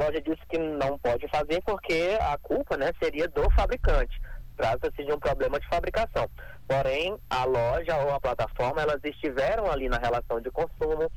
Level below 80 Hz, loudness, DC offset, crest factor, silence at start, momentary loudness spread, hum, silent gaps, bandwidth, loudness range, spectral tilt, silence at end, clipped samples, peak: -34 dBFS; -28 LUFS; under 0.1%; 14 dB; 0 s; 5 LU; none; none; 19 kHz; 1 LU; -6 dB/octave; 0 s; under 0.1%; -12 dBFS